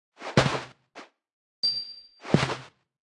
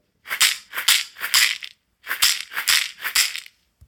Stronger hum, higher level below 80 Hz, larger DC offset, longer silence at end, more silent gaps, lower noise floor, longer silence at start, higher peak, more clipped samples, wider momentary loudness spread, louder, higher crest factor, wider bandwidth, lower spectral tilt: neither; first, -56 dBFS vs -62 dBFS; neither; about the same, 0.35 s vs 0.45 s; first, 1.33-1.63 s vs none; first, -50 dBFS vs -42 dBFS; about the same, 0.2 s vs 0.25 s; second, -6 dBFS vs 0 dBFS; neither; first, 18 LU vs 13 LU; second, -27 LUFS vs -19 LUFS; about the same, 24 dB vs 22 dB; second, 11.5 kHz vs 19 kHz; first, -5 dB/octave vs 4 dB/octave